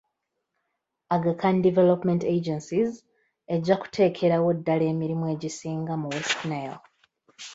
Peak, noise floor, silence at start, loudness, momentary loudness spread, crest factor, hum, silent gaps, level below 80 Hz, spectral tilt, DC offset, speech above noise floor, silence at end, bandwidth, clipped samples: -8 dBFS; -80 dBFS; 1.1 s; -25 LUFS; 10 LU; 18 dB; none; none; -66 dBFS; -6.5 dB/octave; under 0.1%; 56 dB; 0 s; 8 kHz; under 0.1%